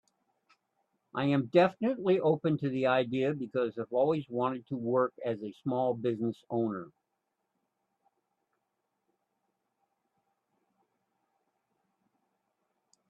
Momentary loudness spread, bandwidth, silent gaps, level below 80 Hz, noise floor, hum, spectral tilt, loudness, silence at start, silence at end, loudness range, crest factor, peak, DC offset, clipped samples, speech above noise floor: 9 LU; 8 kHz; none; -78 dBFS; -83 dBFS; none; -8.5 dB/octave; -31 LUFS; 1.15 s; 6.2 s; 10 LU; 22 dB; -12 dBFS; under 0.1%; under 0.1%; 53 dB